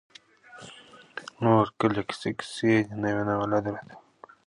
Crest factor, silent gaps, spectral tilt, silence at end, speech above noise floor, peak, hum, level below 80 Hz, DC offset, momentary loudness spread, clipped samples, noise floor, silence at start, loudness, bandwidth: 22 dB; none; -6.5 dB/octave; 0.5 s; 26 dB; -6 dBFS; none; -60 dBFS; under 0.1%; 22 LU; under 0.1%; -51 dBFS; 0.55 s; -26 LUFS; 11 kHz